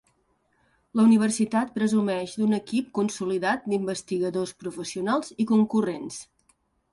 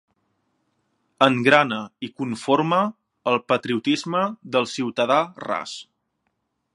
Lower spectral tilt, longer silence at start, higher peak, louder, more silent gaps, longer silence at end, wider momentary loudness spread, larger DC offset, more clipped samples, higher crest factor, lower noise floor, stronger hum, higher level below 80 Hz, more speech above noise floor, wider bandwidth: about the same, -5.5 dB/octave vs -5 dB/octave; second, 0.95 s vs 1.2 s; second, -10 dBFS vs 0 dBFS; second, -25 LUFS vs -22 LUFS; neither; second, 0.7 s vs 0.95 s; about the same, 11 LU vs 12 LU; neither; neither; second, 16 dB vs 24 dB; second, -69 dBFS vs -74 dBFS; neither; about the same, -68 dBFS vs -72 dBFS; second, 44 dB vs 53 dB; about the same, 11.5 kHz vs 11.5 kHz